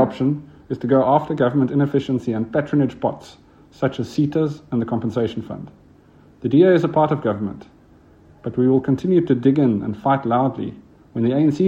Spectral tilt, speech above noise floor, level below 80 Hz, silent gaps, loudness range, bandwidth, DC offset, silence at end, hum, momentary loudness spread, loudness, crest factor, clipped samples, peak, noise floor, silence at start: -9 dB/octave; 31 dB; -56 dBFS; none; 4 LU; 8 kHz; under 0.1%; 0 s; none; 14 LU; -20 LUFS; 18 dB; under 0.1%; -2 dBFS; -50 dBFS; 0 s